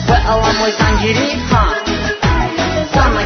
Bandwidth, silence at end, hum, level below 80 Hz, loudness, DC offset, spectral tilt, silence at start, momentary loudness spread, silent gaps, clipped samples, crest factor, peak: 6.8 kHz; 0 s; none; -20 dBFS; -14 LUFS; under 0.1%; -5 dB/octave; 0 s; 4 LU; none; under 0.1%; 14 dB; 0 dBFS